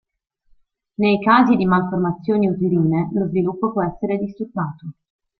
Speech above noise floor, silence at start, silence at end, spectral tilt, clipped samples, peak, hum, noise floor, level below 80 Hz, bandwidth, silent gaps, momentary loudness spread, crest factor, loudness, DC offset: 39 dB; 1 s; 0.5 s; -10 dB/octave; under 0.1%; -2 dBFS; none; -57 dBFS; -54 dBFS; 4.8 kHz; none; 12 LU; 18 dB; -19 LUFS; under 0.1%